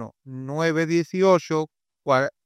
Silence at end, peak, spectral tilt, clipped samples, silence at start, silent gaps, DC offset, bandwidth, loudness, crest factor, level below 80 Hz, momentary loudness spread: 0.15 s; -6 dBFS; -6 dB/octave; under 0.1%; 0 s; none; under 0.1%; 13 kHz; -22 LUFS; 16 dB; -72 dBFS; 16 LU